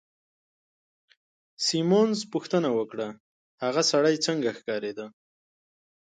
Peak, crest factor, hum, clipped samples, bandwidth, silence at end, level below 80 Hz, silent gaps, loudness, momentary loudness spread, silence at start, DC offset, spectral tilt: -10 dBFS; 18 dB; none; under 0.1%; 9.4 kHz; 1.05 s; -78 dBFS; 3.20-3.58 s; -26 LUFS; 13 LU; 1.6 s; under 0.1%; -4 dB/octave